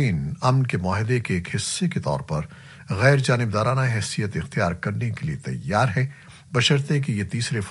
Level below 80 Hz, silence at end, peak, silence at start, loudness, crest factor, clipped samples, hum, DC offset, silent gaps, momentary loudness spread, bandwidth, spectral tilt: -50 dBFS; 0 s; -2 dBFS; 0 s; -23 LUFS; 20 dB; under 0.1%; none; under 0.1%; none; 9 LU; 11.5 kHz; -5.5 dB/octave